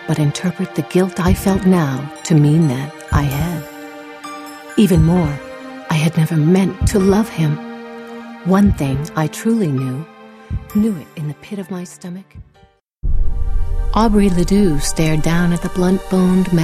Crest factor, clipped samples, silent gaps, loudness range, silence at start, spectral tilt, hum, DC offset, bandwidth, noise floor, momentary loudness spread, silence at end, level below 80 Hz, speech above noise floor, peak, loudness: 16 dB; under 0.1%; none; 8 LU; 0 s; -6.5 dB/octave; none; under 0.1%; 15.5 kHz; -52 dBFS; 17 LU; 0 s; -26 dBFS; 37 dB; 0 dBFS; -17 LUFS